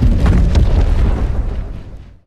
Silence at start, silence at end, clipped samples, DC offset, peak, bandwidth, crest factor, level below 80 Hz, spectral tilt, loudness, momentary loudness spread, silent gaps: 0 s; 0.2 s; under 0.1%; under 0.1%; -2 dBFS; 8.4 kHz; 12 dB; -14 dBFS; -8 dB/octave; -16 LUFS; 17 LU; none